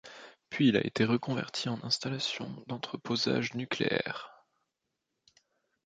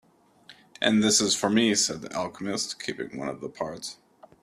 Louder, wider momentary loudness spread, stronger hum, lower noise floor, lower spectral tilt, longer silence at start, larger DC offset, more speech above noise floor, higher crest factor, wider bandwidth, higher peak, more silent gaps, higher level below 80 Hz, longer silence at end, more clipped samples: second, -32 LUFS vs -25 LUFS; about the same, 14 LU vs 14 LU; neither; first, -85 dBFS vs -55 dBFS; first, -5 dB/octave vs -2.5 dB/octave; second, 0.05 s vs 0.5 s; neither; first, 53 dB vs 29 dB; about the same, 22 dB vs 22 dB; second, 9.2 kHz vs 14 kHz; second, -10 dBFS vs -6 dBFS; neither; about the same, -70 dBFS vs -66 dBFS; first, 1.55 s vs 0.5 s; neither